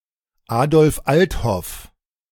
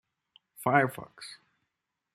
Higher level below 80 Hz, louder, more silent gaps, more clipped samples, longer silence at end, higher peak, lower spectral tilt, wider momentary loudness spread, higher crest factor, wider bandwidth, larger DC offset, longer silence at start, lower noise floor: first, -36 dBFS vs -74 dBFS; first, -18 LUFS vs -28 LUFS; neither; neither; second, 0.45 s vs 0.8 s; first, -2 dBFS vs -8 dBFS; about the same, -6 dB/octave vs -6 dB/octave; second, 15 LU vs 20 LU; second, 16 dB vs 26 dB; first, 18 kHz vs 15.5 kHz; neither; about the same, 0.5 s vs 0.6 s; second, -53 dBFS vs -85 dBFS